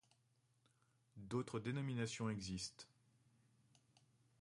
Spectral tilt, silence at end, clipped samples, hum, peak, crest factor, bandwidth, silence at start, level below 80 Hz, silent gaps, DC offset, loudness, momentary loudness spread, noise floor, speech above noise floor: -5 dB/octave; 1.55 s; under 0.1%; none; -30 dBFS; 20 dB; 11.5 kHz; 1.15 s; -72 dBFS; none; under 0.1%; -45 LUFS; 18 LU; -80 dBFS; 35 dB